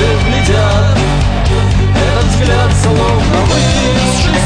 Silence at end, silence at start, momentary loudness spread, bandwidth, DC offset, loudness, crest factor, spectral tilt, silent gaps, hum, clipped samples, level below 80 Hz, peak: 0 s; 0 s; 1 LU; 10 kHz; under 0.1%; -11 LUFS; 10 dB; -5.5 dB/octave; none; none; under 0.1%; -16 dBFS; 0 dBFS